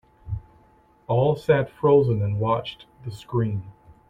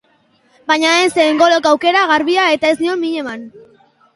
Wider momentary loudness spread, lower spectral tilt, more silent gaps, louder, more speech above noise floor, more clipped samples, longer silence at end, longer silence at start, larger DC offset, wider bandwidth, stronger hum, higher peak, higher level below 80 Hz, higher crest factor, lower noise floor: first, 18 LU vs 12 LU; first, -8.5 dB/octave vs -2 dB/octave; neither; second, -23 LUFS vs -13 LUFS; second, 35 dB vs 42 dB; neither; second, 0.4 s vs 0.55 s; second, 0.25 s vs 0.7 s; neither; second, 9.6 kHz vs 11.5 kHz; neither; second, -6 dBFS vs 0 dBFS; first, -50 dBFS vs -60 dBFS; about the same, 18 dB vs 14 dB; about the same, -57 dBFS vs -56 dBFS